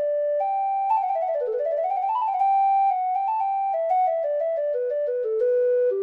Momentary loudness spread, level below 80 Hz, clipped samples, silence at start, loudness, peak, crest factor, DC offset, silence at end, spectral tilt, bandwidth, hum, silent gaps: 5 LU; -74 dBFS; under 0.1%; 0 s; -23 LUFS; -14 dBFS; 10 dB; under 0.1%; 0 s; -4.5 dB/octave; 4.1 kHz; none; none